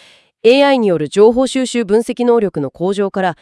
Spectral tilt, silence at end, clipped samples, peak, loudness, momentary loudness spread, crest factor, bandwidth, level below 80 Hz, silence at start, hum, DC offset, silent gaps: -5 dB/octave; 0.1 s; under 0.1%; 0 dBFS; -14 LUFS; 7 LU; 14 dB; 12 kHz; -52 dBFS; 0.45 s; none; under 0.1%; none